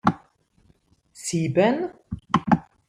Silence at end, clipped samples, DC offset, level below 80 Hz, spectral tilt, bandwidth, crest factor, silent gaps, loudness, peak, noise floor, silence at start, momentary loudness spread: 0.25 s; under 0.1%; under 0.1%; -52 dBFS; -6 dB/octave; 15 kHz; 20 dB; none; -24 LUFS; -4 dBFS; -61 dBFS; 0.05 s; 15 LU